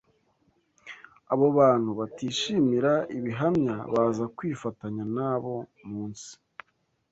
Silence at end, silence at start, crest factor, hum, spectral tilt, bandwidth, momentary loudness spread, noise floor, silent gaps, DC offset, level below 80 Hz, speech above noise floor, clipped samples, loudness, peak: 0.8 s; 0.85 s; 18 dB; none; -6 dB/octave; 8.2 kHz; 22 LU; -72 dBFS; none; under 0.1%; -64 dBFS; 46 dB; under 0.1%; -27 LUFS; -10 dBFS